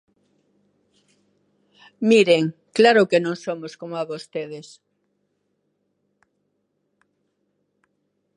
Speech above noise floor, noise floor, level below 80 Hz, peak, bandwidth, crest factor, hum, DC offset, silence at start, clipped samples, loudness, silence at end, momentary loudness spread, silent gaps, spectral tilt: 53 dB; -72 dBFS; -78 dBFS; -2 dBFS; 11 kHz; 22 dB; 50 Hz at -55 dBFS; under 0.1%; 2 s; under 0.1%; -20 LUFS; 3.75 s; 17 LU; none; -5 dB/octave